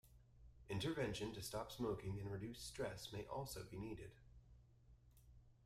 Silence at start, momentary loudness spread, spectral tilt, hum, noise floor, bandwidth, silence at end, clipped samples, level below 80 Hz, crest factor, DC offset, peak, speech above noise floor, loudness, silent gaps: 0.05 s; 22 LU; -5 dB/octave; none; -69 dBFS; 16 kHz; 0 s; under 0.1%; -66 dBFS; 18 dB; under 0.1%; -30 dBFS; 21 dB; -48 LUFS; none